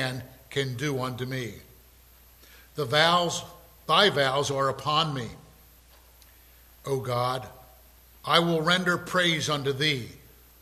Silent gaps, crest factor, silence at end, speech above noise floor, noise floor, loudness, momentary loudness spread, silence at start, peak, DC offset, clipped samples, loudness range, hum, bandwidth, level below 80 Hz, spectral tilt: none; 24 dB; 0.45 s; 29 dB; -55 dBFS; -25 LUFS; 19 LU; 0 s; -4 dBFS; under 0.1%; under 0.1%; 6 LU; none; 15 kHz; -58 dBFS; -4 dB/octave